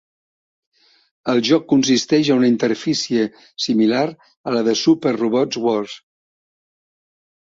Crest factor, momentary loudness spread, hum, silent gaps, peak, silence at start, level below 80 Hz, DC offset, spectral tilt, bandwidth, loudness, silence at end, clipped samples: 16 dB; 9 LU; none; 4.37-4.44 s; -2 dBFS; 1.25 s; -62 dBFS; under 0.1%; -4.5 dB/octave; 7.8 kHz; -18 LUFS; 1.6 s; under 0.1%